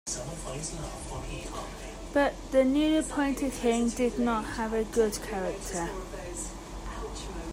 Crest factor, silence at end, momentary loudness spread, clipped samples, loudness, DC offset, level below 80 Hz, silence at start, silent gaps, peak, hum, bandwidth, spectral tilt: 18 dB; 0 s; 13 LU; under 0.1%; -30 LUFS; under 0.1%; -44 dBFS; 0.05 s; none; -12 dBFS; none; 16 kHz; -4.5 dB/octave